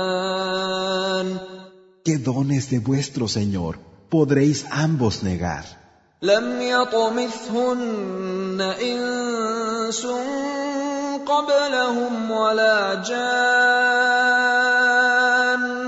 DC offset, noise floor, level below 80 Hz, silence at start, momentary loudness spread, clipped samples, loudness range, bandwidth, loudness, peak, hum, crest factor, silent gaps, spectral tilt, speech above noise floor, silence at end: under 0.1%; -45 dBFS; -54 dBFS; 0 s; 10 LU; under 0.1%; 7 LU; 8 kHz; -21 LUFS; -4 dBFS; none; 16 dB; none; -4.5 dB/octave; 24 dB; 0 s